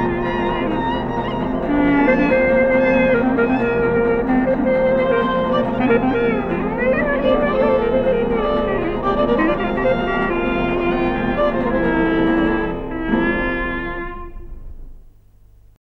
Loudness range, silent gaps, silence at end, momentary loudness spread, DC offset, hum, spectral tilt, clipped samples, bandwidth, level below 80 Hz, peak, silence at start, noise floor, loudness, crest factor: 4 LU; none; 0.9 s; 7 LU; under 0.1%; none; -8.5 dB/octave; under 0.1%; 6 kHz; -32 dBFS; -4 dBFS; 0 s; -47 dBFS; -18 LUFS; 14 dB